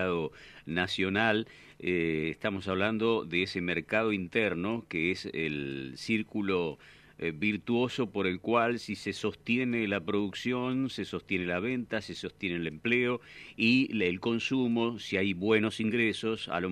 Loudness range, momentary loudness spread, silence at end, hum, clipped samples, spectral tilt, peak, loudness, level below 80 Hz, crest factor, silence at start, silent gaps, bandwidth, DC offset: 3 LU; 8 LU; 0 s; none; under 0.1%; -6 dB/octave; -10 dBFS; -31 LUFS; -64 dBFS; 20 dB; 0 s; none; 12.5 kHz; under 0.1%